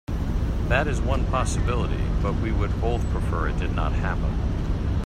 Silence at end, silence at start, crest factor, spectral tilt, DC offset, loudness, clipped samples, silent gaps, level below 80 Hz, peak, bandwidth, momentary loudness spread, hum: 0 s; 0.1 s; 14 dB; -6.5 dB/octave; under 0.1%; -25 LUFS; under 0.1%; none; -26 dBFS; -8 dBFS; 10 kHz; 4 LU; none